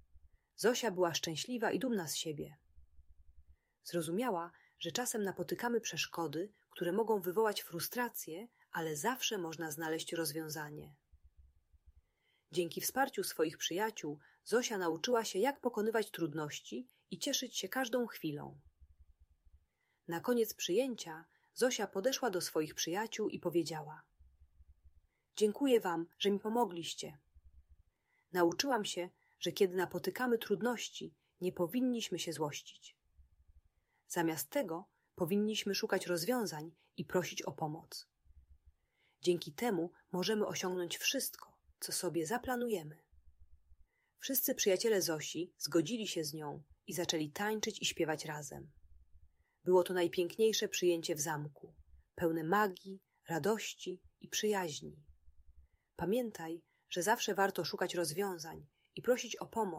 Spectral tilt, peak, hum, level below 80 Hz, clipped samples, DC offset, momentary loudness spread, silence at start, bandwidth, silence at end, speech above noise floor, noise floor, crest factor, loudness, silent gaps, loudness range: -3.5 dB/octave; -18 dBFS; none; -72 dBFS; under 0.1%; under 0.1%; 14 LU; 0.15 s; 16 kHz; 0 s; 42 dB; -79 dBFS; 20 dB; -37 LUFS; none; 5 LU